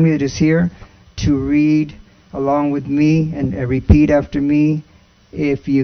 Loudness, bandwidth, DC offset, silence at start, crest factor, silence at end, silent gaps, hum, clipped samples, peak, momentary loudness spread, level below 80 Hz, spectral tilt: -16 LUFS; 6.6 kHz; under 0.1%; 0 s; 16 dB; 0 s; none; none; under 0.1%; 0 dBFS; 9 LU; -30 dBFS; -8 dB/octave